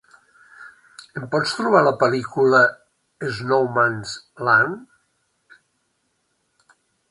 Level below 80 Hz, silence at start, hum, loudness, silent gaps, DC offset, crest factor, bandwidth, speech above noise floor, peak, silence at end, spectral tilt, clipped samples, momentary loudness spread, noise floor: -64 dBFS; 0.6 s; none; -19 LUFS; none; under 0.1%; 20 dB; 11.5 kHz; 51 dB; -2 dBFS; 2.25 s; -5 dB/octave; under 0.1%; 17 LU; -70 dBFS